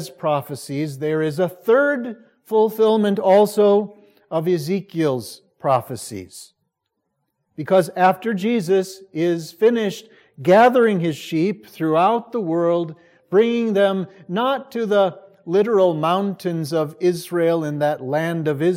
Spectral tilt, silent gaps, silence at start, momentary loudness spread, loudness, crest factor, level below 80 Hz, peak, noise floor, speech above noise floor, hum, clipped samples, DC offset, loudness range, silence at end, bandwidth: -6.5 dB/octave; none; 0 s; 11 LU; -19 LUFS; 18 dB; -72 dBFS; -2 dBFS; -76 dBFS; 57 dB; none; under 0.1%; under 0.1%; 5 LU; 0 s; 16.5 kHz